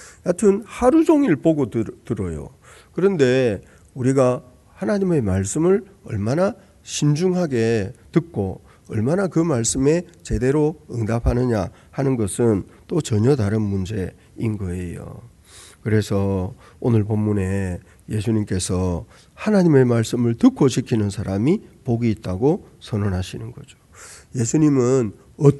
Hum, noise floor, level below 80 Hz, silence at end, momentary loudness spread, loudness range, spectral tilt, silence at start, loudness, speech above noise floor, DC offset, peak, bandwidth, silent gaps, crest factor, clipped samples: none; -46 dBFS; -40 dBFS; 0 s; 13 LU; 4 LU; -6.5 dB/octave; 0 s; -21 LUFS; 26 dB; under 0.1%; 0 dBFS; 12 kHz; none; 20 dB; under 0.1%